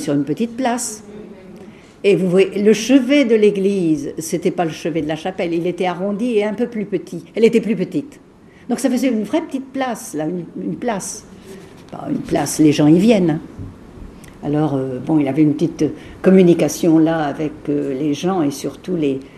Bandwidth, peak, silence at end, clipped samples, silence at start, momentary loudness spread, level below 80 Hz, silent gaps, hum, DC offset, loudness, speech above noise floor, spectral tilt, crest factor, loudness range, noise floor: 14 kHz; 0 dBFS; 0 s; under 0.1%; 0 s; 15 LU; -50 dBFS; none; none; under 0.1%; -17 LUFS; 23 dB; -6 dB/octave; 18 dB; 6 LU; -39 dBFS